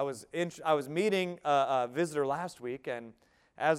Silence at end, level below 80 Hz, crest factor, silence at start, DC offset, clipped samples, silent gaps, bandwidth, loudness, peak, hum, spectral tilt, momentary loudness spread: 0 s; -76 dBFS; 18 dB; 0 s; under 0.1%; under 0.1%; none; 15.5 kHz; -32 LUFS; -14 dBFS; none; -5 dB/octave; 10 LU